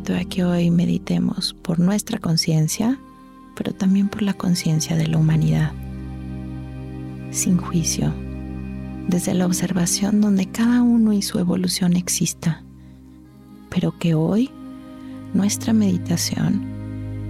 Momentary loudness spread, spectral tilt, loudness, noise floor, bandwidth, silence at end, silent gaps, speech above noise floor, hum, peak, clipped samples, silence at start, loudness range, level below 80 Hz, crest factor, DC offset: 14 LU; -5.5 dB/octave; -21 LUFS; -44 dBFS; 15.5 kHz; 0 s; none; 25 dB; none; -8 dBFS; under 0.1%; 0 s; 5 LU; -42 dBFS; 12 dB; under 0.1%